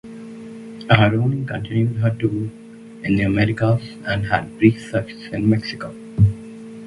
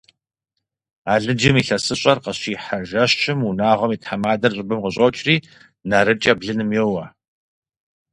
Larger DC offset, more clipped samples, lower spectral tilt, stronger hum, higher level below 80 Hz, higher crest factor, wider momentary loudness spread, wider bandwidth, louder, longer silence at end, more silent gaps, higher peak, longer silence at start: neither; neither; first, -8 dB/octave vs -5 dB/octave; neither; first, -42 dBFS vs -52 dBFS; about the same, 20 dB vs 20 dB; first, 19 LU vs 9 LU; about the same, 11 kHz vs 11.5 kHz; about the same, -20 LUFS vs -19 LUFS; second, 0 s vs 1.05 s; neither; about the same, 0 dBFS vs 0 dBFS; second, 0.05 s vs 1.05 s